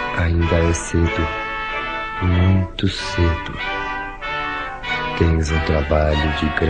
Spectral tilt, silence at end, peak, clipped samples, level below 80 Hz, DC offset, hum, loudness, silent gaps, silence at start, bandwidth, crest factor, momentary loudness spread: -5.5 dB/octave; 0 s; -2 dBFS; under 0.1%; -28 dBFS; 0.2%; none; -20 LUFS; none; 0 s; 9.6 kHz; 18 dB; 7 LU